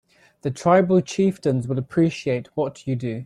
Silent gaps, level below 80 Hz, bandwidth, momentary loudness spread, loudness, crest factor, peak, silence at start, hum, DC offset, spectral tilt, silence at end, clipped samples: none; -58 dBFS; 11.5 kHz; 10 LU; -22 LUFS; 18 dB; -4 dBFS; 0.45 s; none; under 0.1%; -7 dB/octave; 0 s; under 0.1%